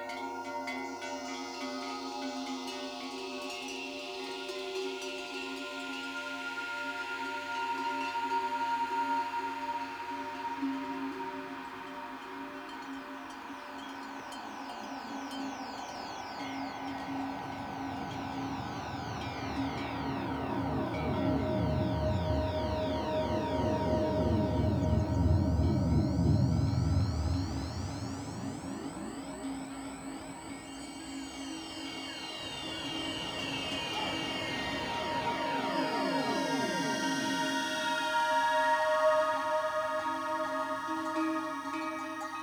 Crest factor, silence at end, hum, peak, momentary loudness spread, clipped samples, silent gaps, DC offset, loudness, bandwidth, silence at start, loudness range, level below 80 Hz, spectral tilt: 16 dB; 0 s; none; -16 dBFS; 12 LU; under 0.1%; none; under 0.1%; -34 LUFS; over 20 kHz; 0 s; 11 LU; -46 dBFS; -5.5 dB/octave